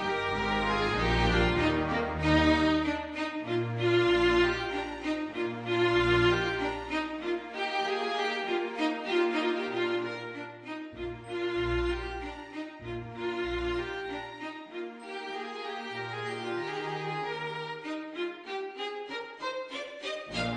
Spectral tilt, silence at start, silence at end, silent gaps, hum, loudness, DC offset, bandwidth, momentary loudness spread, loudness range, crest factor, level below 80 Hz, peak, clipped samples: -6 dB/octave; 0 s; 0 s; none; none; -31 LUFS; under 0.1%; 9.8 kHz; 14 LU; 9 LU; 18 dB; -44 dBFS; -12 dBFS; under 0.1%